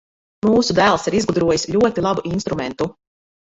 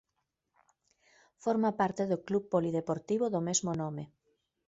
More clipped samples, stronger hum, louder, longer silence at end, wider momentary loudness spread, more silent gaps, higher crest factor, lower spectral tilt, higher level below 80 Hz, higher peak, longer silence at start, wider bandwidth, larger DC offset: neither; neither; first, -18 LUFS vs -32 LUFS; about the same, 0.6 s vs 0.6 s; about the same, 9 LU vs 8 LU; neither; about the same, 18 dB vs 20 dB; about the same, -5 dB/octave vs -5 dB/octave; first, -46 dBFS vs -70 dBFS; first, -2 dBFS vs -14 dBFS; second, 0.45 s vs 1.4 s; about the same, 8.2 kHz vs 8 kHz; neither